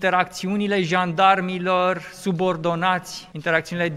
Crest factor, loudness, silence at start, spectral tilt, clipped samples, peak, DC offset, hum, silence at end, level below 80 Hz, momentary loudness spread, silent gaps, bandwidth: 18 dB; -21 LUFS; 0 s; -5 dB/octave; under 0.1%; -2 dBFS; under 0.1%; none; 0 s; -60 dBFS; 9 LU; none; 15 kHz